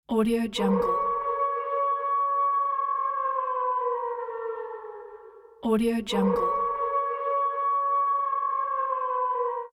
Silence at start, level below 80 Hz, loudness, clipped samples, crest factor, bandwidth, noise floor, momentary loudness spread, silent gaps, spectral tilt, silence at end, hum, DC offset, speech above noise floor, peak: 0.1 s; -58 dBFS; -26 LUFS; under 0.1%; 14 dB; 14.5 kHz; -48 dBFS; 9 LU; none; -6 dB/octave; 0.05 s; none; under 0.1%; 24 dB; -14 dBFS